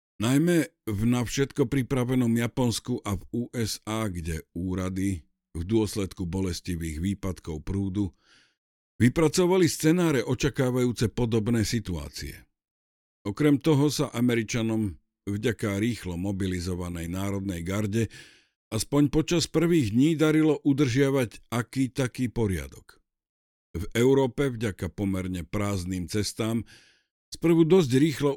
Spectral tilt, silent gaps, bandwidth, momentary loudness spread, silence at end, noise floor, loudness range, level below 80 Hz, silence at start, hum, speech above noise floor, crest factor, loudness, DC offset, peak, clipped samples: -6 dB/octave; 8.58-8.99 s, 12.71-13.25 s, 18.56-18.71 s, 23.29-23.74 s, 27.11-27.32 s; 18 kHz; 11 LU; 0 s; under -90 dBFS; 6 LU; -46 dBFS; 0.2 s; none; over 64 dB; 18 dB; -26 LUFS; under 0.1%; -8 dBFS; under 0.1%